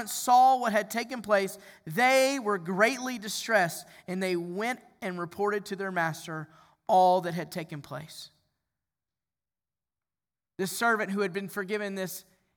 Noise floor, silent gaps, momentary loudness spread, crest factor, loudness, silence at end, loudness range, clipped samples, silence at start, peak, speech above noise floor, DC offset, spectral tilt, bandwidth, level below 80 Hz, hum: under -90 dBFS; none; 18 LU; 20 dB; -28 LUFS; 0.35 s; 8 LU; under 0.1%; 0 s; -10 dBFS; over 62 dB; under 0.1%; -4 dB/octave; over 20 kHz; -76 dBFS; none